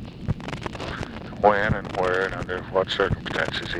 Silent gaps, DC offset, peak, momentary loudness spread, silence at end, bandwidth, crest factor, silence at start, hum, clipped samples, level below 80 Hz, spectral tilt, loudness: none; under 0.1%; -4 dBFS; 12 LU; 0 s; 11.5 kHz; 22 dB; 0 s; none; under 0.1%; -42 dBFS; -6 dB/octave; -25 LUFS